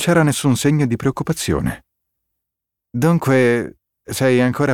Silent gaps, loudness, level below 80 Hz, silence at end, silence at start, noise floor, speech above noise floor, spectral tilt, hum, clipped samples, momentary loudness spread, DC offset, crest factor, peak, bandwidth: none; -17 LUFS; -44 dBFS; 0 s; 0 s; -82 dBFS; 66 dB; -6 dB/octave; none; under 0.1%; 12 LU; under 0.1%; 16 dB; -2 dBFS; 17.5 kHz